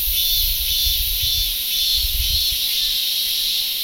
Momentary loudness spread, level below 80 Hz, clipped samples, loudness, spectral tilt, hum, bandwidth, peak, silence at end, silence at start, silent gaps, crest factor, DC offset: 2 LU; -30 dBFS; under 0.1%; -17 LUFS; 1 dB/octave; none; 16.5 kHz; -6 dBFS; 0 s; 0 s; none; 14 dB; under 0.1%